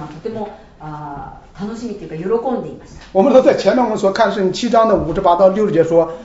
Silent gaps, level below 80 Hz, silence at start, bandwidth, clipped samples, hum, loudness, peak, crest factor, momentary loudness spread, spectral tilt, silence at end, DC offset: none; -42 dBFS; 0 s; 8 kHz; under 0.1%; none; -15 LUFS; 0 dBFS; 16 dB; 19 LU; -6 dB/octave; 0 s; under 0.1%